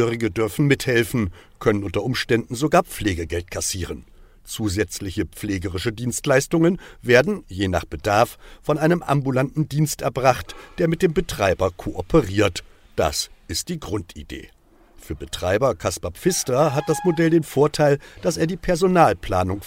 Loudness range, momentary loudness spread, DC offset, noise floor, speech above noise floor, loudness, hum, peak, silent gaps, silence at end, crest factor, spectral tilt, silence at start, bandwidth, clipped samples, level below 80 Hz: 5 LU; 11 LU; under 0.1%; -50 dBFS; 29 dB; -21 LUFS; none; -2 dBFS; none; 0 s; 20 dB; -5 dB/octave; 0 s; 16 kHz; under 0.1%; -42 dBFS